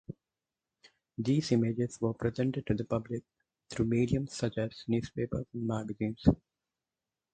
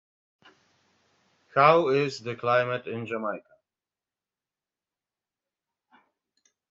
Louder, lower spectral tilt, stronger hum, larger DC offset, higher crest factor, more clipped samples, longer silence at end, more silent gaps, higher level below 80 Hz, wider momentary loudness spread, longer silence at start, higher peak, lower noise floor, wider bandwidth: second, -33 LUFS vs -25 LUFS; first, -7 dB/octave vs -4 dB/octave; neither; neither; about the same, 24 dB vs 26 dB; neither; second, 1 s vs 3.3 s; neither; first, -52 dBFS vs -76 dBFS; second, 11 LU vs 14 LU; second, 0.1 s vs 1.55 s; second, -10 dBFS vs -4 dBFS; about the same, under -90 dBFS vs under -90 dBFS; first, 9.2 kHz vs 7.8 kHz